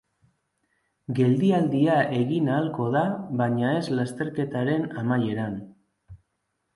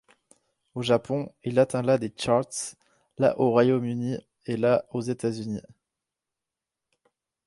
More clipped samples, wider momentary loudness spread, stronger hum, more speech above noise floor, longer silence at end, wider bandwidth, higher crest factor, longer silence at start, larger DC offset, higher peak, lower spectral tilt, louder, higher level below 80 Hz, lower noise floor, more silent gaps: neither; second, 8 LU vs 12 LU; neither; second, 53 dB vs 63 dB; second, 0.6 s vs 1.85 s; about the same, 11.5 kHz vs 11.5 kHz; about the same, 16 dB vs 20 dB; first, 1.1 s vs 0.75 s; neither; about the same, -10 dBFS vs -8 dBFS; first, -8 dB/octave vs -6 dB/octave; about the same, -25 LUFS vs -26 LUFS; about the same, -62 dBFS vs -64 dBFS; second, -77 dBFS vs -88 dBFS; neither